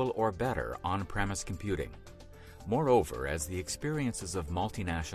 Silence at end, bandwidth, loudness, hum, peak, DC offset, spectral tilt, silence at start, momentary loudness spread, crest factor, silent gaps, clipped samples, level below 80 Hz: 0 s; 16 kHz; -33 LUFS; none; -14 dBFS; under 0.1%; -5 dB/octave; 0 s; 16 LU; 18 dB; none; under 0.1%; -46 dBFS